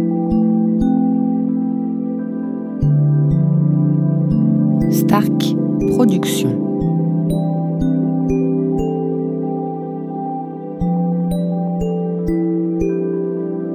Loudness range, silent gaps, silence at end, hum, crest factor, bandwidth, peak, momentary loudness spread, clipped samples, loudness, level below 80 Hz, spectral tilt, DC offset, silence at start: 5 LU; none; 0 s; none; 16 dB; 16 kHz; 0 dBFS; 8 LU; under 0.1%; -17 LUFS; -38 dBFS; -8 dB/octave; under 0.1%; 0 s